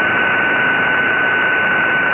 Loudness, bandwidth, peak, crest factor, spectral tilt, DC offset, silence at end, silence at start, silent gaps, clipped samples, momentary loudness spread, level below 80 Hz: -14 LUFS; 3.8 kHz; -4 dBFS; 10 dB; -6.5 dB/octave; under 0.1%; 0 s; 0 s; none; under 0.1%; 0 LU; -50 dBFS